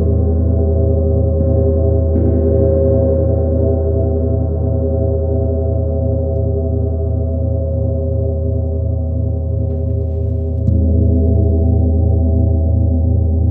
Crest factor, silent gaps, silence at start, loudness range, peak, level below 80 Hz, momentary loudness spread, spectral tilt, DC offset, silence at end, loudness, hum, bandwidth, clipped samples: 12 dB; none; 0 s; 4 LU; -2 dBFS; -18 dBFS; 5 LU; -15 dB/octave; under 0.1%; 0 s; -16 LUFS; none; 1.5 kHz; under 0.1%